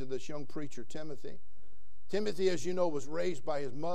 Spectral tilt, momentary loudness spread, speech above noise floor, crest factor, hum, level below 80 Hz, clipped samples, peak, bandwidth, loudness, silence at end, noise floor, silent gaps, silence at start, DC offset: -5.5 dB/octave; 13 LU; 29 dB; 18 dB; none; -66 dBFS; under 0.1%; -16 dBFS; 13.5 kHz; -37 LUFS; 0 s; -65 dBFS; none; 0 s; 3%